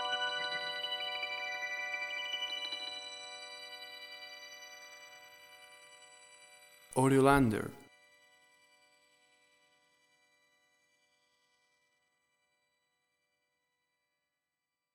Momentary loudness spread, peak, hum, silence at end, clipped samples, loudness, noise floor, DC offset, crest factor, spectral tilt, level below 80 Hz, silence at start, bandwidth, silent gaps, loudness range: 26 LU; -12 dBFS; none; 7.1 s; under 0.1%; -34 LUFS; -89 dBFS; under 0.1%; 28 dB; -4.5 dB/octave; -62 dBFS; 0 s; 16 kHz; none; 15 LU